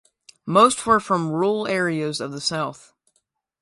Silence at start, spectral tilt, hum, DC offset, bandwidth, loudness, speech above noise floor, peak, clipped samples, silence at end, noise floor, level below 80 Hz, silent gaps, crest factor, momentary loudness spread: 0.45 s; -4.5 dB/octave; none; under 0.1%; 11.5 kHz; -21 LUFS; 51 dB; -2 dBFS; under 0.1%; 0.85 s; -71 dBFS; -60 dBFS; none; 20 dB; 11 LU